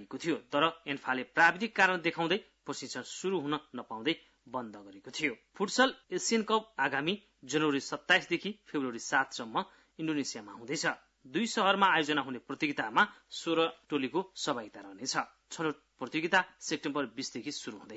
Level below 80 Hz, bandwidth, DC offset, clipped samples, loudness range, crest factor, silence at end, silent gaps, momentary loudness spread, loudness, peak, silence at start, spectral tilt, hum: -76 dBFS; 8 kHz; under 0.1%; under 0.1%; 5 LU; 22 dB; 0 s; none; 13 LU; -32 LUFS; -12 dBFS; 0 s; -1.5 dB/octave; none